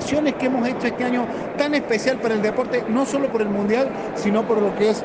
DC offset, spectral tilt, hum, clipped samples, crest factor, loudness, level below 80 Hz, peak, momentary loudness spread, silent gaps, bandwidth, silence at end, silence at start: under 0.1%; -5.5 dB/octave; none; under 0.1%; 14 dB; -21 LUFS; -56 dBFS; -6 dBFS; 4 LU; none; 9.6 kHz; 0 s; 0 s